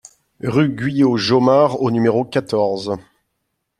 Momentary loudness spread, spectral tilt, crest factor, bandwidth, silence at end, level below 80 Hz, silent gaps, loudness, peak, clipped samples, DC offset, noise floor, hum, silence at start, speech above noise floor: 11 LU; -7 dB/octave; 16 dB; 11.5 kHz; 0.8 s; -56 dBFS; none; -17 LUFS; -2 dBFS; under 0.1%; under 0.1%; -73 dBFS; none; 0.45 s; 57 dB